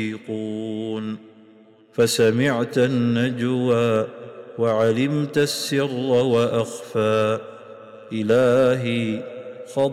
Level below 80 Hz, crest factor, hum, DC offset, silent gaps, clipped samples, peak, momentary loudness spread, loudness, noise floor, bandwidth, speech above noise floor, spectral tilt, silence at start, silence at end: -62 dBFS; 12 dB; none; under 0.1%; none; under 0.1%; -10 dBFS; 15 LU; -21 LUFS; -51 dBFS; 15.5 kHz; 30 dB; -5.5 dB/octave; 0 s; 0 s